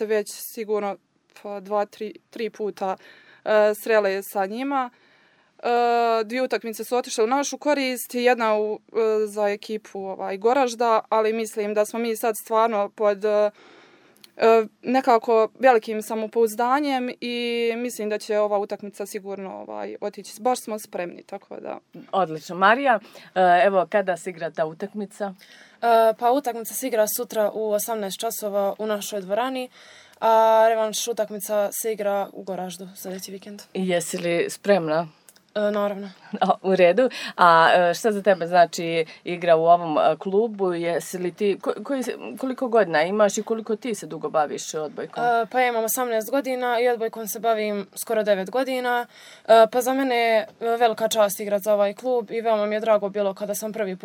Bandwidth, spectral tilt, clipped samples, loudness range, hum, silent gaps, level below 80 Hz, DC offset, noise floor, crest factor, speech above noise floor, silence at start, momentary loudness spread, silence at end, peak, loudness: 20 kHz; -4 dB/octave; under 0.1%; 6 LU; none; none; -82 dBFS; under 0.1%; -59 dBFS; 20 dB; 37 dB; 0 s; 14 LU; 0.1 s; -2 dBFS; -23 LUFS